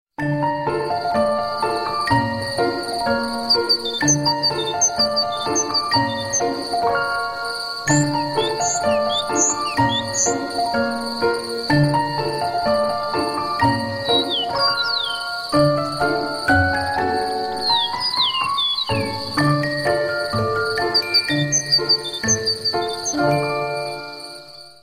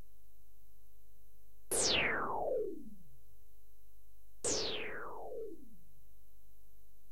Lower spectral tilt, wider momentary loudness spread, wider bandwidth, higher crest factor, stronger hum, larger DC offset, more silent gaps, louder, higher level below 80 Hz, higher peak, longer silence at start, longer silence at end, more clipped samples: first, -3 dB/octave vs -1 dB/octave; second, 6 LU vs 20 LU; about the same, 15.5 kHz vs 16 kHz; second, 16 dB vs 22 dB; neither; second, under 0.1% vs 0.9%; neither; first, -19 LUFS vs -36 LUFS; first, -48 dBFS vs -62 dBFS; first, -4 dBFS vs -20 dBFS; second, 0.2 s vs 1.7 s; second, 0.1 s vs 1.35 s; neither